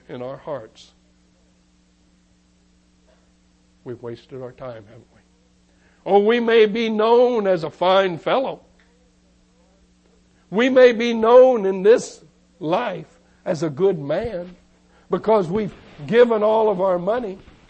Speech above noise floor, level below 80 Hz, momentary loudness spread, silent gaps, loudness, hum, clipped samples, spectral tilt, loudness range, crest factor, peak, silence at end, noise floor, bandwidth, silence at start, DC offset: 40 dB; -56 dBFS; 21 LU; none; -18 LUFS; none; under 0.1%; -6 dB/octave; 22 LU; 18 dB; -2 dBFS; 0.3 s; -58 dBFS; 8.6 kHz; 0.1 s; under 0.1%